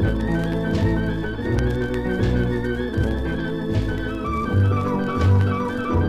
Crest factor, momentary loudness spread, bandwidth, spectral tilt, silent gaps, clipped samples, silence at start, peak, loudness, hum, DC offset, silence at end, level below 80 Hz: 14 dB; 6 LU; 9 kHz; -8 dB/octave; none; under 0.1%; 0 s; -8 dBFS; -22 LUFS; none; 0.2%; 0 s; -30 dBFS